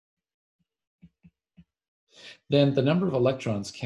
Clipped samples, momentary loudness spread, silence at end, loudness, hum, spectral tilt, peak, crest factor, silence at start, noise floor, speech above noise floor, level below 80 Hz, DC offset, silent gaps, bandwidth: under 0.1%; 19 LU; 0 s; -25 LUFS; none; -7 dB/octave; -8 dBFS; 20 dB; 2.25 s; -61 dBFS; 37 dB; -64 dBFS; under 0.1%; none; 11 kHz